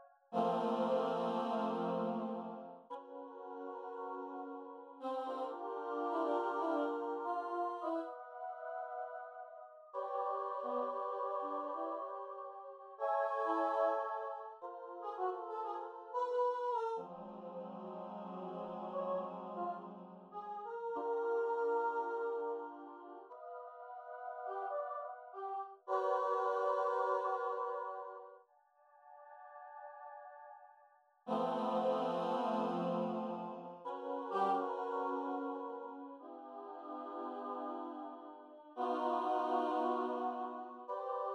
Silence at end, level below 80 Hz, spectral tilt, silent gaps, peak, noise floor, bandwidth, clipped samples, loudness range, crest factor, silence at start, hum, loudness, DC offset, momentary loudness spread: 0 s; under -90 dBFS; -7 dB/octave; none; -22 dBFS; -70 dBFS; 9.8 kHz; under 0.1%; 7 LU; 18 dB; 0 s; none; -40 LUFS; under 0.1%; 16 LU